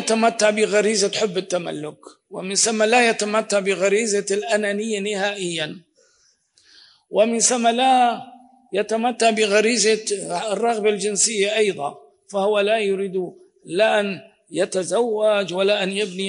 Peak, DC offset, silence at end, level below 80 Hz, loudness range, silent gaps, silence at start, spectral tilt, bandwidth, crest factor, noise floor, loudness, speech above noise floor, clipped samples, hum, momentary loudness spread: -4 dBFS; under 0.1%; 0 s; -80 dBFS; 3 LU; none; 0 s; -2.5 dB/octave; 11 kHz; 16 dB; -62 dBFS; -20 LUFS; 42 dB; under 0.1%; none; 12 LU